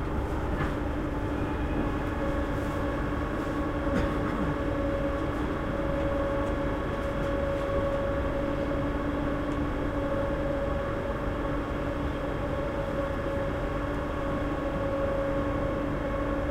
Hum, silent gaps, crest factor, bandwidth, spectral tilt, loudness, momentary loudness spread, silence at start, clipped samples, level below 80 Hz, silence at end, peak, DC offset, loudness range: none; none; 14 dB; 15.5 kHz; -7.5 dB/octave; -30 LUFS; 2 LU; 0 s; under 0.1%; -36 dBFS; 0 s; -16 dBFS; under 0.1%; 1 LU